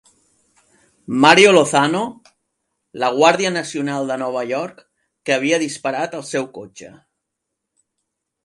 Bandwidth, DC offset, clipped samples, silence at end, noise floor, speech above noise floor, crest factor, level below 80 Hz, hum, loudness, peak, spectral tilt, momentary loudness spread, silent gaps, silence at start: 11.5 kHz; under 0.1%; under 0.1%; 1.55 s; -79 dBFS; 62 dB; 20 dB; -66 dBFS; none; -17 LUFS; 0 dBFS; -3.5 dB/octave; 18 LU; none; 1.1 s